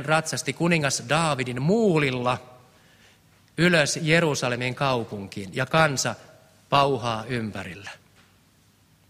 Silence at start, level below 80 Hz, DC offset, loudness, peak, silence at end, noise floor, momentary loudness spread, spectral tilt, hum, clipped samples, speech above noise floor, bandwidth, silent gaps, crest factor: 0 s; -56 dBFS; under 0.1%; -23 LUFS; -6 dBFS; 1.15 s; -60 dBFS; 14 LU; -4.5 dB/octave; none; under 0.1%; 36 dB; 16 kHz; none; 20 dB